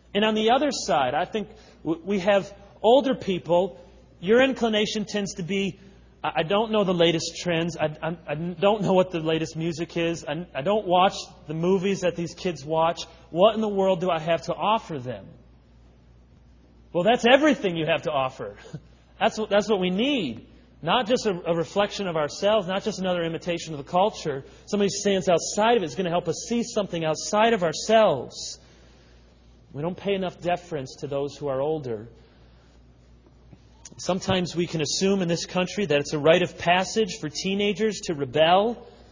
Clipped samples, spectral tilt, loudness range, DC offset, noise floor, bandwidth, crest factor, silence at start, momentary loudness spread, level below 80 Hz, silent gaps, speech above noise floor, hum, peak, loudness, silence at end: under 0.1%; -4.5 dB/octave; 7 LU; under 0.1%; -53 dBFS; 7.6 kHz; 22 dB; 0.15 s; 12 LU; -54 dBFS; none; 29 dB; none; -4 dBFS; -24 LUFS; 0.1 s